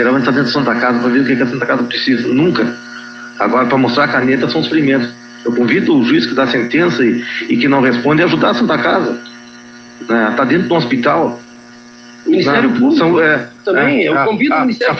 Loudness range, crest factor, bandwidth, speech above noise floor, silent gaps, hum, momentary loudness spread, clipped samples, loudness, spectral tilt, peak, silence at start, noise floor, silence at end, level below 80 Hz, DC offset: 2 LU; 12 dB; 7 kHz; 25 dB; none; none; 8 LU; under 0.1%; -13 LUFS; -6.5 dB/octave; 0 dBFS; 0 s; -37 dBFS; 0 s; -54 dBFS; under 0.1%